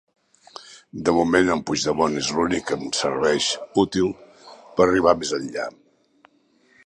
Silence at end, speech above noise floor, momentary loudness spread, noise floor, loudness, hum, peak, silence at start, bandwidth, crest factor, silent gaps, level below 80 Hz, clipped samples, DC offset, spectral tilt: 1.15 s; 39 dB; 15 LU; -61 dBFS; -21 LUFS; none; -2 dBFS; 0.6 s; 11.5 kHz; 20 dB; none; -52 dBFS; under 0.1%; under 0.1%; -4 dB/octave